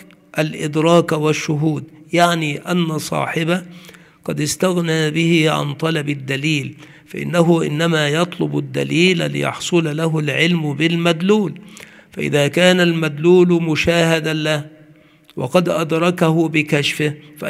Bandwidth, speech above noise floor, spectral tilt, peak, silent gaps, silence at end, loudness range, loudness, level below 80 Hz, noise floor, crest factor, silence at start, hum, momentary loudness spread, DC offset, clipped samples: 15.5 kHz; 31 dB; -5.5 dB/octave; 0 dBFS; none; 0 s; 3 LU; -17 LUFS; -54 dBFS; -48 dBFS; 18 dB; 0 s; none; 8 LU; under 0.1%; under 0.1%